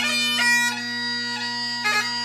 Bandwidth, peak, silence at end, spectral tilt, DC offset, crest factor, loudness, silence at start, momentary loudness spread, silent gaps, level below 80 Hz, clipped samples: 15.5 kHz; -10 dBFS; 0 s; -0.5 dB/octave; under 0.1%; 14 dB; -21 LUFS; 0 s; 7 LU; none; -70 dBFS; under 0.1%